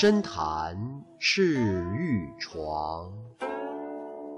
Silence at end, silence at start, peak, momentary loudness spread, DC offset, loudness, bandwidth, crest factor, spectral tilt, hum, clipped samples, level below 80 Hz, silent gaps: 0 s; 0 s; -10 dBFS; 15 LU; under 0.1%; -29 LUFS; 10 kHz; 18 dB; -5.5 dB/octave; none; under 0.1%; -54 dBFS; none